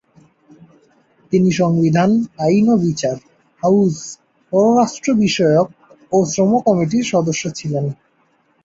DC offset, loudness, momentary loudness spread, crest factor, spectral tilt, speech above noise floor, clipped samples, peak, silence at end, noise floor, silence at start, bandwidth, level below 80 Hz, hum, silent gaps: under 0.1%; -16 LUFS; 9 LU; 14 dB; -6 dB/octave; 44 dB; under 0.1%; -2 dBFS; 0.7 s; -59 dBFS; 1.3 s; 7.8 kHz; -56 dBFS; none; none